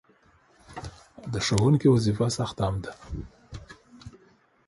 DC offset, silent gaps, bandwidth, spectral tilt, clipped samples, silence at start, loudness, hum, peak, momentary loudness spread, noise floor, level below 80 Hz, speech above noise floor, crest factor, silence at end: under 0.1%; none; 11.5 kHz; -6 dB/octave; under 0.1%; 0.7 s; -25 LUFS; none; -8 dBFS; 24 LU; -61 dBFS; -46 dBFS; 37 dB; 20 dB; 0.6 s